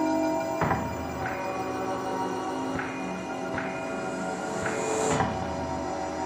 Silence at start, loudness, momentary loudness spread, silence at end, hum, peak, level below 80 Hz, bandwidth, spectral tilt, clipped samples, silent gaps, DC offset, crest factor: 0 s; -30 LUFS; 6 LU; 0 s; none; -12 dBFS; -52 dBFS; 15.5 kHz; -5 dB/octave; under 0.1%; none; under 0.1%; 18 dB